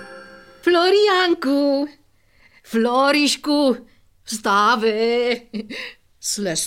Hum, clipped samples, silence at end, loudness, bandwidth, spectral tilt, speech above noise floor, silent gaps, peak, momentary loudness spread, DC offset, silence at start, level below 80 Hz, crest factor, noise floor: none; under 0.1%; 0 s; -18 LUFS; 16.5 kHz; -3 dB/octave; 38 dB; none; -6 dBFS; 15 LU; 0.1%; 0 s; -60 dBFS; 14 dB; -56 dBFS